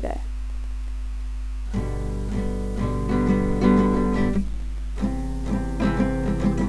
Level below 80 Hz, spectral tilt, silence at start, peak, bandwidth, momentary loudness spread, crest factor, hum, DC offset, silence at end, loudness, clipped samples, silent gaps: -28 dBFS; -8 dB/octave; 0 s; -6 dBFS; 11 kHz; 13 LU; 16 dB; none; 0.6%; 0 s; -25 LUFS; under 0.1%; none